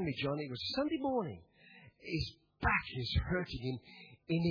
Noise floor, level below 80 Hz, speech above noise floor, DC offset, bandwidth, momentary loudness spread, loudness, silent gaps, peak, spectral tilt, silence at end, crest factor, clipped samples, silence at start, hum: -60 dBFS; -50 dBFS; 24 dB; under 0.1%; 5.4 kHz; 14 LU; -37 LUFS; none; -18 dBFS; -4.5 dB/octave; 0 s; 20 dB; under 0.1%; 0 s; none